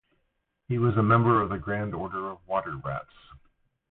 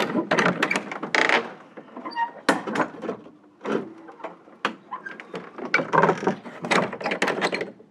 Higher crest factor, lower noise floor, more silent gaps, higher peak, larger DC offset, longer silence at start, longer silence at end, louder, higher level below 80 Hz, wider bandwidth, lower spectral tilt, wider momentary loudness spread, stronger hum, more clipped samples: about the same, 20 dB vs 24 dB; first, -76 dBFS vs -47 dBFS; neither; second, -8 dBFS vs -2 dBFS; neither; first, 0.7 s vs 0 s; first, 0.9 s vs 0.15 s; second, -27 LUFS vs -24 LUFS; first, -52 dBFS vs -74 dBFS; second, 4.1 kHz vs 13.5 kHz; first, -12 dB/octave vs -4.5 dB/octave; second, 14 LU vs 19 LU; neither; neither